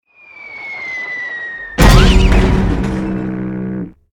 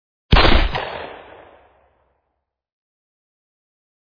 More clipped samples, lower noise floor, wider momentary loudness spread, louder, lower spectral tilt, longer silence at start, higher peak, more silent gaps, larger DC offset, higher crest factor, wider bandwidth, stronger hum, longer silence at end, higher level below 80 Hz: neither; second, -37 dBFS vs -75 dBFS; second, 17 LU vs 21 LU; about the same, -15 LUFS vs -17 LUFS; about the same, -5.5 dB/octave vs -6.5 dB/octave; about the same, 0.35 s vs 0.3 s; about the same, 0 dBFS vs 0 dBFS; neither; neither; second, 14 dB vs 20 dB; first, 18 kHz vs 5.2 kHz; neither; second, 0.2 s vs 2.95 s; first, -16 dBFS vs -24 dBFS